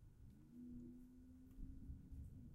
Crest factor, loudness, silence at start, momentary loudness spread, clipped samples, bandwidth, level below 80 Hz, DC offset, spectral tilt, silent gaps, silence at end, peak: 16 dB; -60 LUFS; 0 s; 7 LU; under 0.1%; 15 kHz; -60 dBFS; under 0.1%; -9 dB/octave; none; 0 s; -40 dBFS